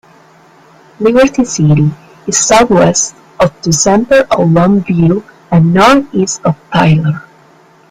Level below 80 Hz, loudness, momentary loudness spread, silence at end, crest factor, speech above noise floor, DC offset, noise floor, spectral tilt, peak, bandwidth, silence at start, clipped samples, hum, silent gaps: -40 dBFS; -10 LUFS; 8 LU; 0.7 s; 10 dB; 34 dB; under 0.1%; -43 dBFS; -5 dB/octave; 0 dBFS; 13 kHz; 1 s; under 0.1%; none; none